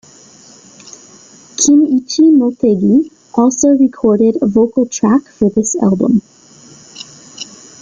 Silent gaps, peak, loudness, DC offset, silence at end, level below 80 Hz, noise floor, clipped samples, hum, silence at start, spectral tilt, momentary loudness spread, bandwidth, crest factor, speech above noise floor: none; 0 dBFS; -12 LUFS; under 0.1%; 0.35 s; -50 dBFS; -41 dBFS; under 0.1%; none; 0.85 s; -5.5 dB/octave; 19 LU; 9.4 kHz; 12 dB; 30 dB